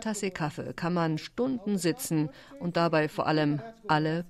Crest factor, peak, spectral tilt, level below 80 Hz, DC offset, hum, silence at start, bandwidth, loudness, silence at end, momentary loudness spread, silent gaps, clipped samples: 18 dB; -12 dBFS; -5.5 dB/octave; -62 dBFS; under 0.1%; none; 0 s; 14 kHz; -29 LUFS; 0 s; 8 LU; none; under 0.1%